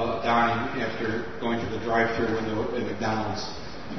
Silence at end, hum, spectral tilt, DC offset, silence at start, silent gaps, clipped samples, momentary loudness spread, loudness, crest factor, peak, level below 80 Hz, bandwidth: 0 s; none; -5.5 dB/octave; 1%; 0 s; none; under 0.1%; 8 LU; -27 LUFS; 18 dB; -10 dBFS; -50 dBFS; 6.4 kHz